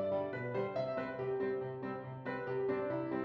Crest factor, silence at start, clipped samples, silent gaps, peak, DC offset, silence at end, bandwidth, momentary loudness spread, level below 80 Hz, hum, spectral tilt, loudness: 14 dB; 0 s; under 0.1%; none; -24 dBFS; under 0.1%; 0 s; 5.8 kHz; 6 LU; -74 dBFS; none; -9 dB/octave; -38 LUFS